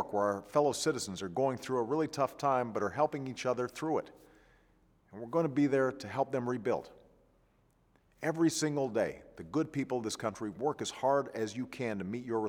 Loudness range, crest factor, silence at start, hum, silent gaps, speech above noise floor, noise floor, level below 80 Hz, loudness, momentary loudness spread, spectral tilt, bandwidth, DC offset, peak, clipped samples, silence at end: 3 LU; 20 dB; 0 s; none; none; 36 dB; -69 dBFS; -70 dBFS; -34 LUFS; 8 LU; -5 dB/octave; 17.5 kHz; under 0.1%; -14 dBFS; under 0.1%; 0 s